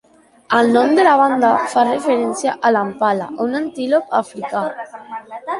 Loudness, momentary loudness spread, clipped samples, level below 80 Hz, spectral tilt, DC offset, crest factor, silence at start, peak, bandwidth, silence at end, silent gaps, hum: -16 LUFS; 14 LU; under 0.1%; -62 dBFS; -4.5 dB/octave; under 0.1%; 16 dB; 0.5 s; -2 dBFS; 11.5 kHz; 0 s; none; none